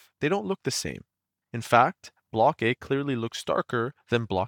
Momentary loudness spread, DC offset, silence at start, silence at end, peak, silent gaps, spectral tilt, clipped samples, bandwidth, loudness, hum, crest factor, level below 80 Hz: 15 LU; under 0.1%; 0.2 s; 0 s; -6 dBFS; none; -5 dB/octave; under 0.1%; 19 kHz; -26 LUFS; none; 20 dB; -64 dBFS